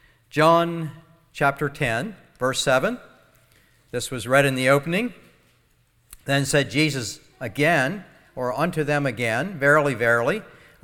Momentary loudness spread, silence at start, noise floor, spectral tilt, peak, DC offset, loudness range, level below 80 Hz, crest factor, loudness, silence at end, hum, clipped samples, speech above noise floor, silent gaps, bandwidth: 15 LU; 0.35 s; -62 dBFS; -4.5 dB/octave; -2 dBFS; under 0.1%; 3 LU; -54 dBFS; 22 dB; -22 LUFS; 0.35 s; none; under 0.1%; 41 dB; none; 17.5 kHz